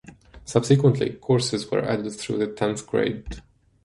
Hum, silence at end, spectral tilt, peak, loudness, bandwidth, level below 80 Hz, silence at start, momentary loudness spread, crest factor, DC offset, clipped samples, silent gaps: none; 0.45 s; -6 dB/octave; -4 dBFS; -23 LUFS; 11.5 kHz; -48 dBFS; 0.05 s; 15 LU; 20 dB; under 0.1%; under 0.1%; none